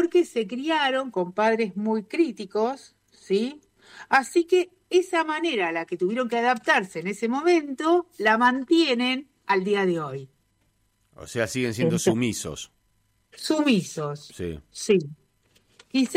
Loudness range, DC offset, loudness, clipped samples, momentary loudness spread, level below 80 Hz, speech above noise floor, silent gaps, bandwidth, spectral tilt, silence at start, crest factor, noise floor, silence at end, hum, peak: 5 LU; under 0.1%; -24 LUFS; under 0.1%; 12 LU; -62 dBFS; 44 dB; none; 15.5 kHz; -4.5 dB/octave; 0 s; 16 dB; -68 dBFS; 0 s; none; -8 dBFS